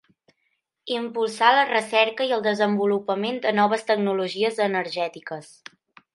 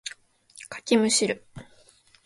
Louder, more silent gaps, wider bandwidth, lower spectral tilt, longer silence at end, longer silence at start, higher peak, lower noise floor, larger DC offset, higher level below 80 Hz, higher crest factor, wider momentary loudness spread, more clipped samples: about the same, -22 LUFS vs -23 LUFS; neither; about the same, 11.5 kHz vs 11.5 kHz; first, -4.5 dB/octave vs -2.5 dB/octave; about the same, 0.7 s vs 0.65 s; first, 0.85 s vs 0.05 s; first, -2 dBFS vs -6 dBFS; first, -74 dBFS vs -58 dBFS; neither; second, -78 dBFS vs -64 dBFS; about the same, 22 dB vs 22 dB; second, 11 LU vs 19 LU; neither